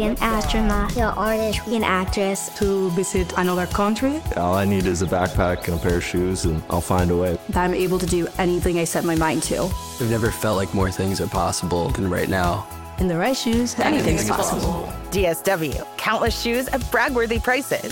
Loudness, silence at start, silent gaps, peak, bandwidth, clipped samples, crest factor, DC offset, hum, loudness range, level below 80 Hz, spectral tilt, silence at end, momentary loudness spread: -22 LUFS; 0 s; none; -4 dBFS; 17 kHz; under 0.1%; 16 dB; 0.1%; none; 1 LU; -32 dBFS; -5 dB/octave; 0 s; 4 LU